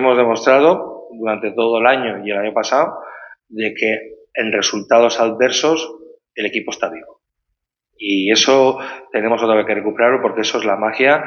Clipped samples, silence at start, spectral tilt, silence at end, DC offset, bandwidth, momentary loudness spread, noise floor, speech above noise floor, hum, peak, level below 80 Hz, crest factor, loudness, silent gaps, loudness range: under 0.1%; 0 s; -3 dB/octave; 0 s; under 0.1%; 7.2 kHz; 13 LU; -76 dBFS; 60 dB; none; 0 dBFS; -64 dBFS; 16 dB; -16 LUFS; none; 3 LU